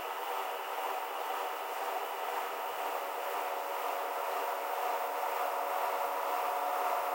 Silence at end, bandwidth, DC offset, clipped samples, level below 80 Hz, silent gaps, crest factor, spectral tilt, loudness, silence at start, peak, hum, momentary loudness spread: 0 s; 16.5 kHz; under 0.1%; under 0.1%; -86 dBFS; none; 16 dB; 0 dB/octave; -35 LUFS; 0 s; -20 dBFS; none; 4 LU